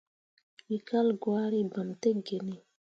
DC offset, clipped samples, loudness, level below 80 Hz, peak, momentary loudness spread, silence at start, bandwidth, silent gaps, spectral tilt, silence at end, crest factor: under 0.1%; under 0.1%; -31 LUFS; -80 dBFS; -16 dBFS; 9 LU; 0.7 s; 7.6 kHz; none; -7 dB/octave; 0.35 s; 16 dB